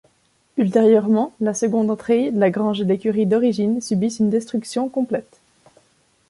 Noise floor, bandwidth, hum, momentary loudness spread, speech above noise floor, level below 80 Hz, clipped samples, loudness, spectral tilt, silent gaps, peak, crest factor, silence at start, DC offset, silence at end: -62 dBFS; 11.5 kHz; none; 8 LU; 44 dB; -64 dBFS; under 0.1%; -19 LUFS; -6.5 dB/octave; none; -4 dBFS; 16 dB; 0.55 s; under 0.1%; 1.05 s